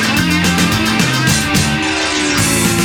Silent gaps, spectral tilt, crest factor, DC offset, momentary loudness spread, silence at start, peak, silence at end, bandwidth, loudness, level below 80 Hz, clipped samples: none; -3.5 dB/octave; 14 dB; 0.2%; 2 LU; 0 s; 0 dBFS; 0 s; 17.5 kHz; -13 LUFS; -32 dBFS; under 0.1%